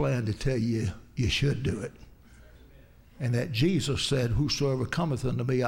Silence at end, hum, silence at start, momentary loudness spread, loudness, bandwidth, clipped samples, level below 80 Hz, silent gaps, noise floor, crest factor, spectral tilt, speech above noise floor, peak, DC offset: 0 s; none; 0 s; 6 LU; -28 LUFS; 16 kHz; under 0.1%; -44 dBFS; none; -54 dBFS; 16 dB; -5.5 dB/octave; 26 dB; -12 dBFS; under 0.1%